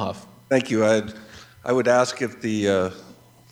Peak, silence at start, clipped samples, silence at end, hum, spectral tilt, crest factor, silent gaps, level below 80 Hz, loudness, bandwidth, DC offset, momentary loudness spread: -4 dBFS; 0 s; under 0.1%; 0.4 s; none; -5 dB/octave; 18 dB; none; -62 dBFS; -22 LUFS; 16 kHz; under 0.1%; 15 LU